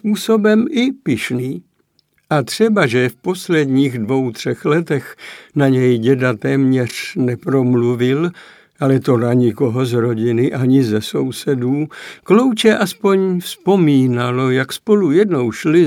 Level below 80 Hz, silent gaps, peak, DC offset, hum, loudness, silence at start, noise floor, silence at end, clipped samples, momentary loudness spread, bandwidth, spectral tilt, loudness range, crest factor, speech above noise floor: -62 dBFS; none; 0 dBFS; under 0.1%; none; -16 LUFS; 0.05 s; -61 dBFS; 0 s; under 0.1%; 8 LU; 17 kHz; -6.5 dB/octave; 2 LU; 16 dB; 46 dB